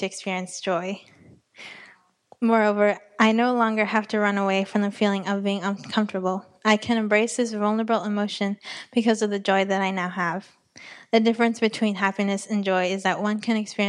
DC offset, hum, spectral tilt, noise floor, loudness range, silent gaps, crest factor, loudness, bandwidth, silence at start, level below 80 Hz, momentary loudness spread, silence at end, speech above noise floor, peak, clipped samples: under 0.1%; none; -5 dB/octave; -56 dBFS; 2 LU; none; 20 dB; -23 LUFS; 11 kHz; 0 s; -76 dBFS; 8 LU; 0 s; 33 dB; -4 dBFS; under 0.1%